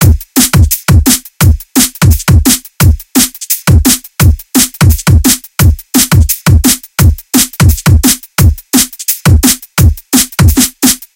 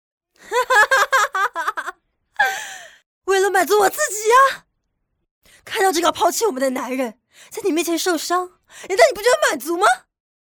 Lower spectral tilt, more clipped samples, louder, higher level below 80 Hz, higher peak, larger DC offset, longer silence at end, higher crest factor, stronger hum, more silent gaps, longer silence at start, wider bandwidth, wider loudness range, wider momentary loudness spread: first, -4 dB/octave vs -1 dB/octave; first, 2% vs under 0.1%; first, -8 LUFS vs -18 LUFS; first, -16 dBFS vs -60 dBFS; about the same, 0 dBFS vs -2 dBFS; neither; second, 0.2 s vs 0.55 s; second, 8 dB vs 18 dB; neither; second, none vs 3.06-3.22 s, 5.31-5.41 s; second, 0 s vs 0.45 s; about the same, over 20 kHz vs over 20 kHz; about the same, 1 LU vs 3 LU; second, 3 LU vs 15 LU